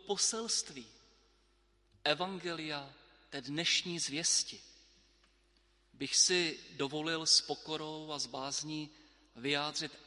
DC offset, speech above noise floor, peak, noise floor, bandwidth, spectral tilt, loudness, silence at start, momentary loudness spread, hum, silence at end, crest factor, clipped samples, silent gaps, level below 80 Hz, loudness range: under 0.1%; 36 dB; -14 dBFS; -71 dBFS; 11.5 kHz; -1.5 dB/octave; -33 LUFS; 0.05 s; 16 LU; none; 0 s; 22 dB; under 0.1%; none; -72 dBFS; 5 LU